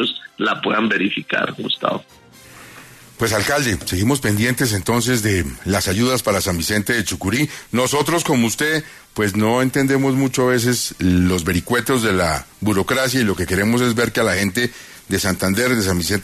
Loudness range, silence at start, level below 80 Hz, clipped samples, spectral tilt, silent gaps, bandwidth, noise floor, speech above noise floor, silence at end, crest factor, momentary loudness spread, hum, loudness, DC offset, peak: 3 LU; 0 s; -44 dBFS; under 0.1%; -4.5 dB/octave; none; 14 kHz; -42 dBFS; 24 dB; 0 s; 16 dB; 5 LU; none; -18 LUFS; under 0.1%; -2 dBFS